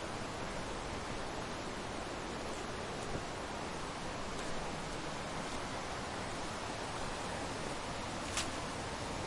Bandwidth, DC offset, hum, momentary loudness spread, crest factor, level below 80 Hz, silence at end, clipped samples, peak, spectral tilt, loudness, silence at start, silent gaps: 11.5 kHz; under 0.1%; none; 2 LU; 16 dB; -52 dBFS; 0 s; under 0.1%; -24 dBFS; -3.5 dB/octave; -41 LUFS; 0 s; none